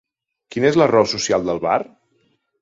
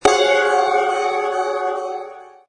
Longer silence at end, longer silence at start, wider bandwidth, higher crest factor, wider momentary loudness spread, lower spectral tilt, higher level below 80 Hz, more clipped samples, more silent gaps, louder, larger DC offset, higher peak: first, 0.8 s vs 0.2 s; first, 0.5 s vs 0 s; second, 7.8 kHz vs 10.5 kHz; about the same, 18 dB vs 18 dB; about the same, 11 LU vs 13 LU; first, -4.5 dB/octave vs -1.5 dB/octave; about the same, -54 dBFS vs -54 dBFS; neither; neither; about the same, -18 LUFS vs -18 LUFS; neither; about the same, 0 dBFS vs 0 dBFS